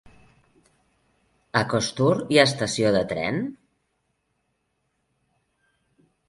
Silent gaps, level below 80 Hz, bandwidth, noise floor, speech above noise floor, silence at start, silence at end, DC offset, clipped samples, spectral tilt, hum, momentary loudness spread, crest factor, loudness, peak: none; -58 dBFS; 11.5 kHz; -74 dBFS; 52 dB; 1.55 s; 2.75 s; under 0.1%; under 0.1%; -4.5 dB/octave; none; 9 LU; 24 dB; -22 LUFS; -2 dBFS